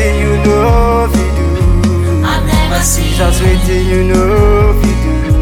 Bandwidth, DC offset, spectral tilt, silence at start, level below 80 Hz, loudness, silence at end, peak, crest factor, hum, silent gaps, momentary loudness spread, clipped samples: 17.5 kHz; under 0.1%; -5.5 dB/octave; 0 s; -14 dBFS; -11 LUFS; 0 s; 0 dBFS; 10 dB; none; none; 3 LU; under 0.1%